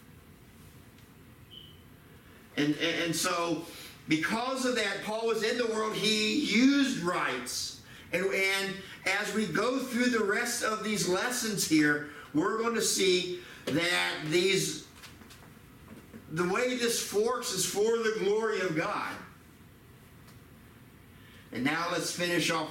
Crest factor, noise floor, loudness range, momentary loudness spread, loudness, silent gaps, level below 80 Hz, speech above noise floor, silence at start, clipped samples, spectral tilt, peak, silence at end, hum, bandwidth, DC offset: 16 dB; -54 dBFS; 6 LU; 13 LU; -29 LUFS; none; -66 dBFS; 25 dB; 0.1 s; under 0.1%; -3 dB/octave; -14 dBFS; 0 s; none; 17 kHz; under 0.1%